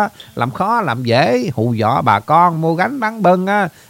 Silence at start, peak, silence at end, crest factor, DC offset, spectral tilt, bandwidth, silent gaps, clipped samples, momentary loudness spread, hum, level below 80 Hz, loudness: 0 s; 0 dBFS; 0.2 s; 14 dB; under 0.1%; -7 dB/octave; 16.5 kHz; none; under 0.1%; 6 LU; none; -56 dBFS; -15 LUFS